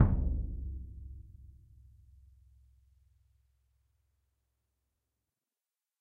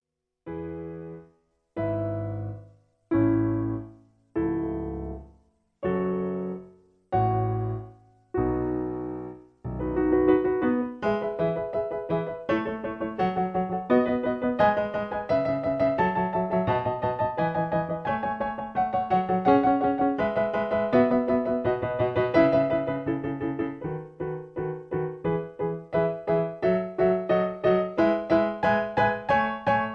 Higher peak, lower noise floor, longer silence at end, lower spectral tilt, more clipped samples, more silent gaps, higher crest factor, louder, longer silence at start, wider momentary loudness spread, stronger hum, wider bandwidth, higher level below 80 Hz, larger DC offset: second, -10 dBFS vs -6 dBFS; first, under -90 dBFS vs -64 dBFS; first, 4.55 s vs 0 s; first, -12 dB/octave vs -9.5 dB/octave; neither; neither; first, 28 dB vs 20 dB; second, -37 LUFS vs -26 LUFS; second, 0 s vs 0.45 s; first, 27 LU vs 12 LU; neither; second, 2.5 kHz vs 6.4 kHz; first, -42 dBFS vs -50 dBFS; neither